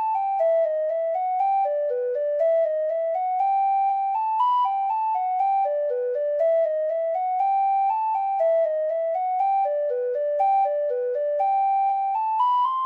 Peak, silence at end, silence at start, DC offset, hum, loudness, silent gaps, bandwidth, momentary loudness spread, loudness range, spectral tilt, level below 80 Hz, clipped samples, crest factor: -12 dBFS; 0 s; 0 s; under 0.1%; none; -23 LUFS; none; 4.9 kHz; 4 LU; 1 LU; -2 dB/octave; -76 dBFS; under 0.1%; 10 dB